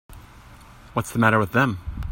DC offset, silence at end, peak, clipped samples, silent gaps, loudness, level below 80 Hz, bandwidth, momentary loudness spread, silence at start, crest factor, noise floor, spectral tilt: under 0.1%; 0 s; -2 dBFS; under 0.1%; none; -22 LUFS; -40 dBFS; 16.5 kHz; 11 LU; 0.1 s; 22 dB; -46 dBFS; -6 dB/octave